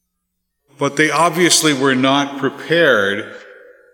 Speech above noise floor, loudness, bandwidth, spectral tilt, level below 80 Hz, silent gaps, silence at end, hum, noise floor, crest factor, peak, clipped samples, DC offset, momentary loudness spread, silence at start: 58 dB; -15 LUFS; 17.5 kHz; -3 dB/octave; -68 dBFS; none; 0.4 s; none; -73 dBFS; 16 dB; 0 dBFS; under 0.1%; under 0.1%; 11 LU; 0.8 s